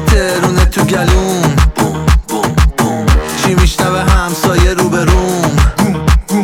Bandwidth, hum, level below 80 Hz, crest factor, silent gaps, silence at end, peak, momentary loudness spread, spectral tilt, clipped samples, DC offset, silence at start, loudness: 17 kHz; none; -14 dBFS; 10 dB; none; 0 s; 0 dBFS; 2 LU; -5.5 dB/octave; 0.1%; under 0.1%; 0 s; -12 LUFS